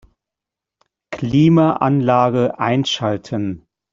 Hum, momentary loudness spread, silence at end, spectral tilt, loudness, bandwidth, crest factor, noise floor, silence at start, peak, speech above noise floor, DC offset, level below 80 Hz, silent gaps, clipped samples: none; 14 LU; 0.35 s; -7 dB/octave; -17 LUFS; 7.6 kHz; 16 dB; -86 dBFS; 1.1 s; -2 dBFS; 70 dB; under 0.1%; -52 dBFS; none; under 0.1%